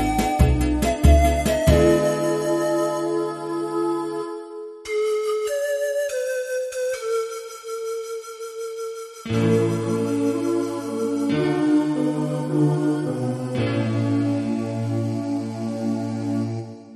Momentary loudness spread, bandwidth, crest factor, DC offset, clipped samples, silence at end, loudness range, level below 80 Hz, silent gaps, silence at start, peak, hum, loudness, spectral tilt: 12 LU; 13.5 kHz; 18 dB; under 0.1%; under 0.1%; 0 s; 6 LU; -30 dBFS; none; 0 s; -4 dBFS; none; -23 LUFS; -6.5 dB/octave